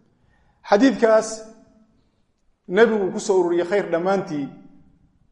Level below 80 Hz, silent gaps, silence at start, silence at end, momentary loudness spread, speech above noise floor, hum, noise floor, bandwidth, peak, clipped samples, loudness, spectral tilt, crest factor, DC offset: -62 dBFS; none; 0.65 s; 0.75 s; 13 LU; 45 dB; none; -64 dBFS; 11 kHz; -2 dBFS; under 0.1%; -20 LUFS; -5 dB/octave; 20 dB; under 0.1%